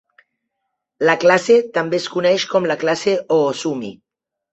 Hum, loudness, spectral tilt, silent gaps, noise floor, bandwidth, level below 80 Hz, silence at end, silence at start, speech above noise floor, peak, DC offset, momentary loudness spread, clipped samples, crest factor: none; -17 LUFS; -4.5 dB/octave; none; -77 dBFS; 8.2 kHz; -64 dBFS; 0.6 s; 1 s; 60 dB; -2 dBFS; under 0.1%; 10 LU; under 0.1%; 16 dB